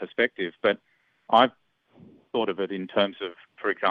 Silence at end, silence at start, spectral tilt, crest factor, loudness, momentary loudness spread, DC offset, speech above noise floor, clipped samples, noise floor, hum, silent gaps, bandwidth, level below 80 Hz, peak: 0 s; 0 s; -6.5 dB/octave; 22 dB; -26 LUFS; 12 LU; under 0.1%; 30 dB; under 0.1%; -55 dBFS; none; none; 6.4 kHz; -74 dBFS; -4 dBFS